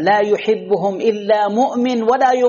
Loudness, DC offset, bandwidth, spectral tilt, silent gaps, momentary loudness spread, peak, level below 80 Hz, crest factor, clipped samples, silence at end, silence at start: -16 LUFS; under 0.1%; 7.2 kHz; -3.5 dB/octave; none; 3 LU; -4 dBFS; -62 dBFS; 12 dB; under 0.1%; 0 s; 0 s